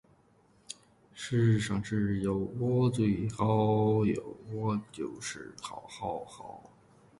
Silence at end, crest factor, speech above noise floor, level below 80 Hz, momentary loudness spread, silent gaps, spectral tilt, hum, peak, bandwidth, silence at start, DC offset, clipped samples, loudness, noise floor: 0.6 s; 18 dB; 35 dB; -58 dBFS; 20 LU; none; -7 dB/octave; none; -14 dBFS; 11.5 kHz; 0.7 s; under 0.1%; under 0.1%; -31 LUFS; -65 dBFS